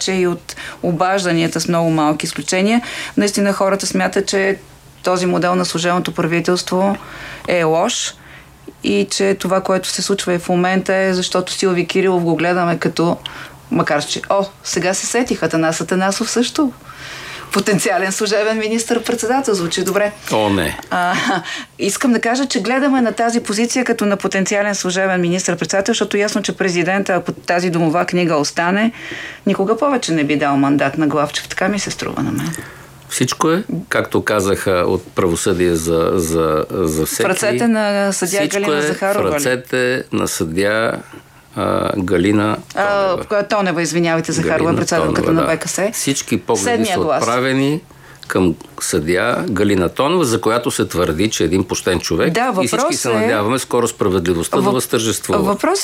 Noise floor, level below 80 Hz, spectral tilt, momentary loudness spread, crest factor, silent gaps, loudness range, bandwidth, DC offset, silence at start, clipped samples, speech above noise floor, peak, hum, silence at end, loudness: -39 dBFS; -46 dBFS; -4.5 dB/octave; 4 LU; 16 dB; none; 2 LU; 16.5 kHz; under 0.1%; 0 s; under 0.1%; 22 dB; 0 dBFS; none; 0 s; -17 LUFS